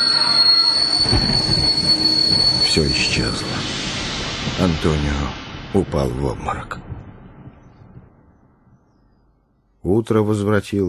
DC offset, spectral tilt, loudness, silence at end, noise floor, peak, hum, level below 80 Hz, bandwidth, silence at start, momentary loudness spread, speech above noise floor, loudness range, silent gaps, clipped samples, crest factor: under 0.1%; -4 dB/octave; -16 LUFS; 0 s; -60 dBFS; -2 dBFS; none; -34 dBFS; 14 kHz; 0 s; 14 LU; 41 dB; 16 LU; none; under 0.1%; 18 dB